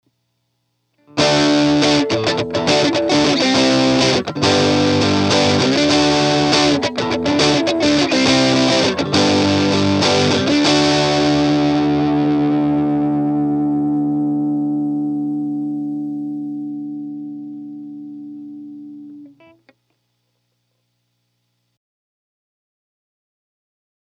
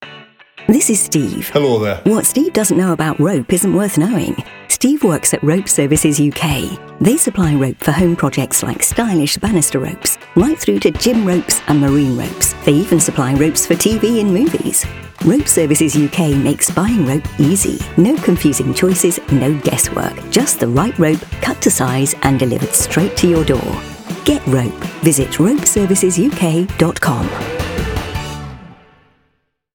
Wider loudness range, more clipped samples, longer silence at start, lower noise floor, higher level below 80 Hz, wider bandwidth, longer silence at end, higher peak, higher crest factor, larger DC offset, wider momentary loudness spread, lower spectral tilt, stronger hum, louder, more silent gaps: first, 14 LU vs 1 LU; neither; first, 1.15 s vs 0 s; first, -69 dBFS vs -65 dBFS; second, -48 dBFS vs -36 dBFS; second, 10.5 kHz vs over 20 kHz; first, 4.75 s vs 1 s; about the same, 0 dBFS vs 0 dBFS; about the same, 18 dB vs 14 dB; neither; first, 16 LU vs 6 LU; about the same, -4.5 dB/octave vs -4.5 dB/octave; first, 60 Hz at -55 dBFS vs none; about the same, -15 LUFS vs -14 LUFS; neither